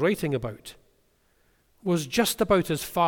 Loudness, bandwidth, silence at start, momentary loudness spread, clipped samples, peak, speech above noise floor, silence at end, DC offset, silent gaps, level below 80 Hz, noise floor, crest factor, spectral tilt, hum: -26 LUFS; 19 kHz; 0 s; 15 LU; under 0.1%; -10 dBFS; 41 dB; 0 s; under 0.1%; none; -52 dBFS; -66 dBFS; 18 dB; -4.5 dB/octave; none